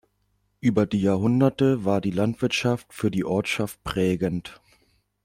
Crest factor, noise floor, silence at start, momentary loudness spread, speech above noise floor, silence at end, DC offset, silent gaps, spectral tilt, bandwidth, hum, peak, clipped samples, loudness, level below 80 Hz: 16 dB; -70 dBFS; 0.65 s; 7 LU; 47 dB; 0.7 s; under 0.1%; none; -6.5 dB/octave; 16 kHz; none; -8 dBFS; under 0.1%; -24 LUFS; -52 dBFS